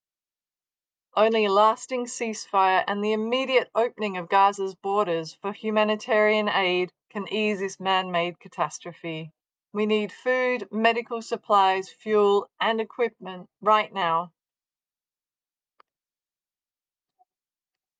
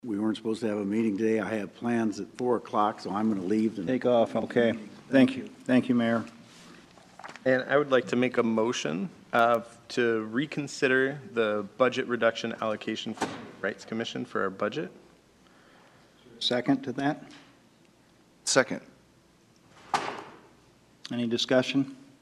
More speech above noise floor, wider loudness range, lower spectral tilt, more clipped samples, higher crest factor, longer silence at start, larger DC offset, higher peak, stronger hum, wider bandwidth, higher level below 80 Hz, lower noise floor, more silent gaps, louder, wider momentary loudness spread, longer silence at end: first, over 66 dB vs 33 dB; about the same, 5 LU vs 7 LU; about the same, -4 dB/octave vs -4.5 dB/octave; neither; about the same, 20 dB vs 22 dB; first, 1.15 s vs 0.05 s; neither; about the same, -6 dBFS vs -6 dBFS; neither; second, 9.6 kHz vs 12.5 kHz; second, -86 dBFS vs -72 dBFS; first, under -90 dBFS vs -61 dBFS; neither; first, -24 LUFS vs -28 LUFS; about the same, 11 LU vs 10 LU; first, 3.7 s vs 0.25 s